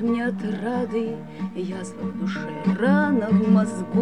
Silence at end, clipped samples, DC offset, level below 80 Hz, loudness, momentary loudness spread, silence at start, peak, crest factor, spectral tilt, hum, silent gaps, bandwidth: 0 s; under 0.1%; 0.3%; -62 dBFS; -23 LUFS; 12 LU; 0 s; -8 dBFS; 16 dB; -7.5 dB/octave; none; none; 10 kHz